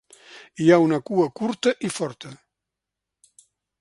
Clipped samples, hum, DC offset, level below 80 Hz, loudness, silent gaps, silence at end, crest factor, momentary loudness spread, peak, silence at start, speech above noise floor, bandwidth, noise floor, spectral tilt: under 0.1%; none; under 0.1%; -66 dBFS; -22 LUFS; none; 1.45 s; 22 dB; 24 LU; -2 dBFS; 0.35 s; 64 dB; 11.5 kHz; -85 dBFS; -5.5 dB/octave